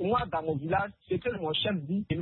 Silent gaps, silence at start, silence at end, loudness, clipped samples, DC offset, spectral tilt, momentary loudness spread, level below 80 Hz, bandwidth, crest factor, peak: none; 0 s; 0 s; -31 LUFS; under 0.1%; under 0.1%; -10 dB/octave; 4 LU; -54 dBFS; 4.3 kHz; 14 dB; -16 dBFS